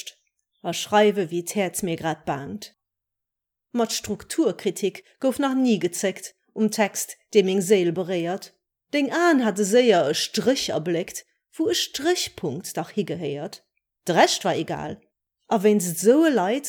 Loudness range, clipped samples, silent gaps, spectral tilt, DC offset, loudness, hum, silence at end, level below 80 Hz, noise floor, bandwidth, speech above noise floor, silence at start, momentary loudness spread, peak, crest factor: 6 LU; under 0.1%; none; -4 dB/octave; under 0.1%; -23 LUFS; none; 0 s; -64 dBFS; -85 dBFS; 19.5 kHz; 63 dB; 0.05 s; 14 LU; -4 dBFS; 20 dB